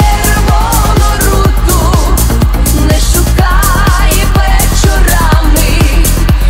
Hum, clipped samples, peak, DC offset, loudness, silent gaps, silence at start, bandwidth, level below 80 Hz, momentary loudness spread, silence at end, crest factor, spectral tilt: none; 0.2%; 0 dBFS; 0.6%; -9 LUFS; none; 0 s; 16.5 kHz; -8 dBFS; 1 LU; 0 s; 6 dB; -4.5 dB/octave